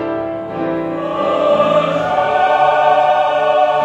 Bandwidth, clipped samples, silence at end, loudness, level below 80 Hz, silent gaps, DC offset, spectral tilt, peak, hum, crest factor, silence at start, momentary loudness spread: 8.2 kHz; under 0.1%; 0 s; -14 LUFS; -52 dBFS; none; under 0.1%; -6 dB/octave; 0 dBFS; none; 14 dB; 0 s; 9 LU